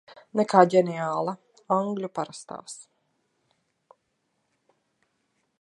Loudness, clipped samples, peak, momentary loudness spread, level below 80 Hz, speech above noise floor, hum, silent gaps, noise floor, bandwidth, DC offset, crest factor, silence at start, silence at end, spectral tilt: -25 LUFS; under 0.1%; -2 dBFS; 22 LU; -80 dBFS; 51 dB; none; none; -75 dBFS; 11.5 kHz; under 0.1%; 26 dB; 0.35 s; 2.8 s; -6 dB/octave